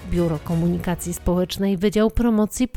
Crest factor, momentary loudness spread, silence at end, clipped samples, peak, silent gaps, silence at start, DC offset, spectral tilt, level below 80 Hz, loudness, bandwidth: 14 dB; 5 LU; 0.1 s; under 0.1%; -6 dBFS; none; 0 s; under 0.1%; -6 dB/octave; -32 dBFS; -21 LUFS; 19.5 kHz